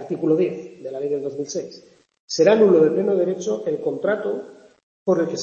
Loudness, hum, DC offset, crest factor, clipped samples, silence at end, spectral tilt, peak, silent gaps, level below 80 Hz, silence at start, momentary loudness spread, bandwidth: -21 LUFS; none; under 0.1%; 18 dB; under 0.1%; 0 s; -5.5 dB/octave; -4 dBFS; 2.20-2.28 s, 4.83-5.06 s; -70 dBFS; 0 s; 15 LU; 7.6 kHz